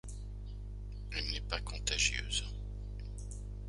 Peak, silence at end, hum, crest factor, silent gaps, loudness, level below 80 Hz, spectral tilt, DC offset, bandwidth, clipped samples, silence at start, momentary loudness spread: -16 dBFS; 0 s; 50 Hz at -40 dBFS; 24 dB; none; -38 LUFS; -42 dBFS; -2 dB/octave; under 0.1%; 11.5 kHz; under 0.1%; 0.05 s; 16 LU